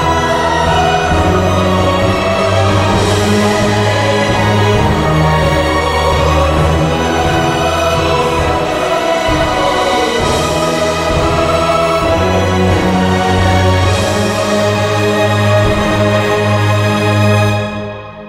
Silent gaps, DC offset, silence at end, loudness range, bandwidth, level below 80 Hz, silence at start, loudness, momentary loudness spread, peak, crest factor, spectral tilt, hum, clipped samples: none; under 0.1%; 0 s; 1 LU; 16 kHz; -26 dBFS; 0 s; -12 LUFS; 2 LU; 0 dBFS; 12 dB; -5.5 dB/octave; none; under 0.1%